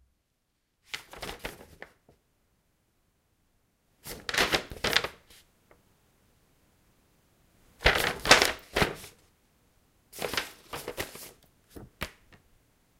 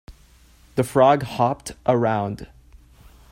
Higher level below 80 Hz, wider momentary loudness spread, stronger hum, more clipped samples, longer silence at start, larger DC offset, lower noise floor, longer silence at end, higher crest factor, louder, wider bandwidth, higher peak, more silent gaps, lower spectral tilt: about the same, -50 dBFS vs -50 dBFS; first, 27 LU vs 13 LU; neither; neither; first, 0.95 s vs 0.1 s; neither; first, -77 dBFS vs -52 dBFS; about the same, 0.9 s vs 0.85 s; first, 32 dB vs 20 dB; second, -28 LUFS vs -21 LUFS; about the same, 16.5 kHz vs 16 kHz; first, 0 dBFS vs -4 dBFS; neither; second, -2 dB/octave vs -6.5 dB/octave